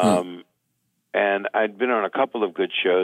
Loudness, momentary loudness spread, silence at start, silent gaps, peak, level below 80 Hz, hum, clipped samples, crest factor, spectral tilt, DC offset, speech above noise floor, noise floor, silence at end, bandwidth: -23 LUFS; 7 LU; 0 s; none; -6 dBFS; -70 dBFS; none; under 0.1%; 18 dB; -5 dB/octave; under 0.1%; 51 dB; -73 dBFS; 0 s; 13 kHz